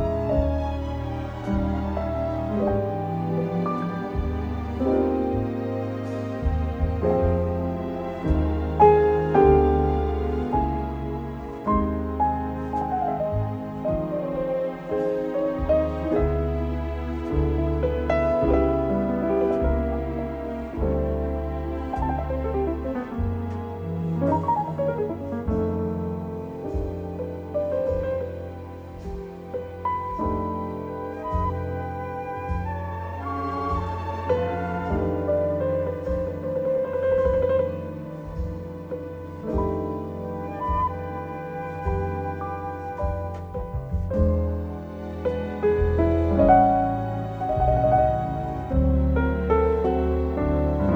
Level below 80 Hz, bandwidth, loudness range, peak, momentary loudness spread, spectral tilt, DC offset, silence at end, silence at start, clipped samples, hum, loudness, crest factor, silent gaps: -32 dBFS; 6.6 kHz; 8 LU; -4 dBFS; 11 LU; -9.5 dB/octave; under 0.1%; 0 s; 0 s; under 0.1%; none; -25 LUFS; 20 dB; none